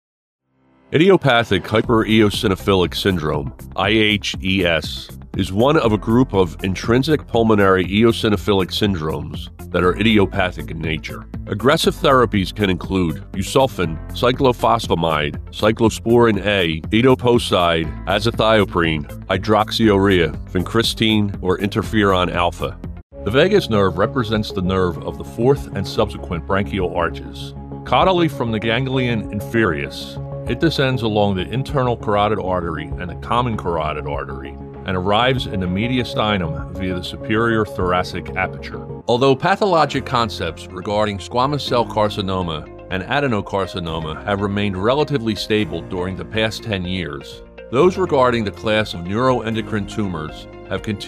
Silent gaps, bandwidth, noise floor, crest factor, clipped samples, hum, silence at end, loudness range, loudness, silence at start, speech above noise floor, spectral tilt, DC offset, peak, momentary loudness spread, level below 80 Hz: 23.03-23.10 s; 15 kHz; -56 dBFS; 16 dB; under 0.1%; none; 0 s; 4 LU; -18 LUFS; 0.9 s; 38 dB; -6 dB/octave; under 0.1%; -2 dBFS; 12 LU; -36 dBFS